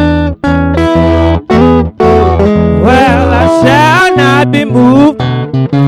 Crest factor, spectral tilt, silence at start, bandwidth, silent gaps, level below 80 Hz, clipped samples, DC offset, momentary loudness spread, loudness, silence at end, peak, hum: 6 dB; -7 dB/octave; 0 s; 13.5 kHz; none; -22 dBFS; 3%; under 0.1%; 6 LU; -7 LUFS; 0 s; 0 dBFS; none